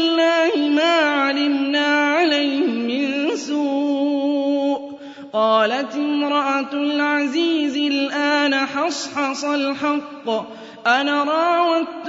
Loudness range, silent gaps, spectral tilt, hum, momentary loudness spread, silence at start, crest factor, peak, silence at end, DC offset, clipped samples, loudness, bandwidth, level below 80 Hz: 3 LU; none; -3 dB/octave; none; 7 LU; 0 s; 16 dB; -4 dBFS; 0 s; under 0.1%; under 0.1%; -19 LUFS; 7.8 kHz; -74 dBFS